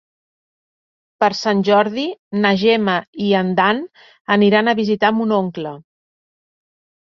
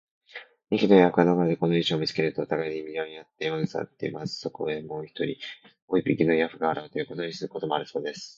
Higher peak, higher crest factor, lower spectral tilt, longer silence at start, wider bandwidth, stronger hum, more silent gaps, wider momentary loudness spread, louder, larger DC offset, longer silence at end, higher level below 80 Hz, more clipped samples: about the same, -2 dBFS vs -4 dBFS; second, 16 dB vs 22 dB; about the same, -6 dB/octave vs -6.5 dB/octave; first, 1.2 s vs 0.35 s; about the same, 7.2 kHz vs 7.8 kHz; neither; first, 2.19-2.31 s, 3.08-3.13 s, 4.21-4.25 s vs 5.82-5.88 s; second, 11 LU vs 14 LU; first, -17 LUFS vs -26 LUFS; neither; first, 1.2 s vs 0.05 s; about the same, -62 dBFS vs -66 dBFS; neither